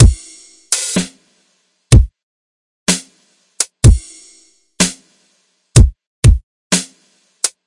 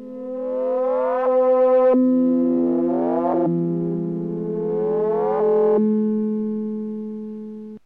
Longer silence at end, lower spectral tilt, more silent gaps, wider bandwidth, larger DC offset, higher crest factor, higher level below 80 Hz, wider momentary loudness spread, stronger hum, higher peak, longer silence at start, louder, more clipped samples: about the same, 0.2 s vs 0.1 s; second, -4.5 dB/octave vs -11.5 dB/octave; first, 2.23-2.86 s, 6.07-6.23 s, 6.43-6.70 s vs none; first, 11.5 kHz vs 3.8 kHz; second, under 0.1% vs 0.2%; about the same, 14 dB vs 10 dB; first, -20 dBFS vs -66 dBFS; about the same, 12 LU vs 13 LU; neither; first, 0 dBFS vs -10 dBFS; about the same, 0 s vs 0 s; first, -15 LUFS vs -20 LUFS; neither